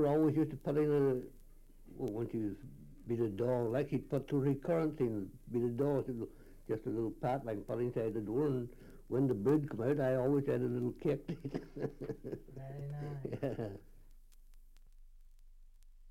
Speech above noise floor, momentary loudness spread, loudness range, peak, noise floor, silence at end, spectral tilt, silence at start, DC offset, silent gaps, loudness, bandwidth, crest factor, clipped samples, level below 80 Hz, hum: 22 dB; 13 LU; 10 LU; -20 dBFS; -57 dBFS; 0 s; -9.5 dB/octave; 0 s; under 0.1%; none; -36 LUFS; 16.5 kHz; 16 dB; under 0.1%; -58 dBFS; none